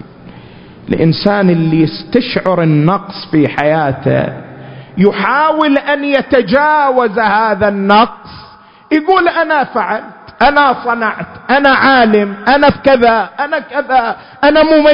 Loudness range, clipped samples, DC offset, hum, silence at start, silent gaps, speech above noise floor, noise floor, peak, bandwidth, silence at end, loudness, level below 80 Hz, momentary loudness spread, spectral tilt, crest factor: 3 LU; 0.1%; under 0.1%; none; 0.05 s; none; 28 dB; -39 dBFS; 0 dBFS; 5.8 kHz; 0 s; -11 LUFS; -42 dBFS; 8 LU; -8.5 dB/octave; 12 dB